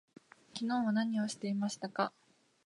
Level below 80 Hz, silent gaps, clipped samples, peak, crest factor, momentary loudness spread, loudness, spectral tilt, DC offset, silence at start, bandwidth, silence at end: -84 dBFS; none; under 0.1%; -18 dBFS; 18 dB; 6 LU; -35 LUFS; -5 dB/octave; under 0.1%; 0.55 s; 11.5 kHz; 0.55 s